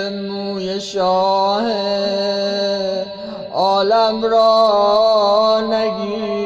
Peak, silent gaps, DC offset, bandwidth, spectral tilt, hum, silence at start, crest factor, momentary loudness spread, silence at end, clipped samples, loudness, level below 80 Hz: -4 dBFS; none; under 0.1%; 8 kHz; -5 dB/octave; none; 0 s; 12 dB; 10 LU; 0 s; under 0.1%; -16 LUFS; -54 dBFS